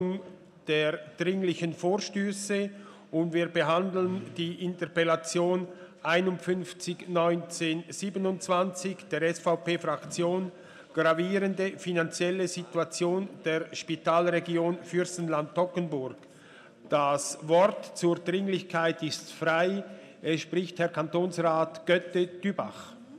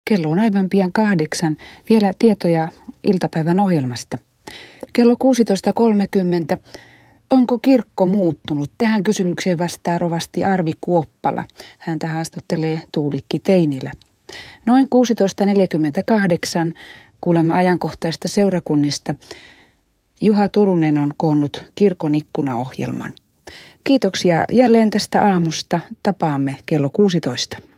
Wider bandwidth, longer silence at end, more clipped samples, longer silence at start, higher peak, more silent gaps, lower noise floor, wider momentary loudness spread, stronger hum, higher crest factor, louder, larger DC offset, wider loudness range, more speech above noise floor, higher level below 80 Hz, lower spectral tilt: second, 13 kHz vs 15.5 kHz; second, 0 s vs 0.2 s; neither; about the same, 0 s vs 0.05 s; second, -12 dBFS vs -2 dBFS; neither; second, -53 dBFS vs -61 dBFS; about the same, 9 LU vs 11 LU; neither; about the same, 18 dB vs 16 dB; second, -29 LUFS vs -18 LUFS; neither; about the same, 2 LU vs 4 LU; second, 24 dB vs 44 dB; second, -80 dBFS vs -58 dBFS; second, -5 dB/octave vs -6.5 dB/octave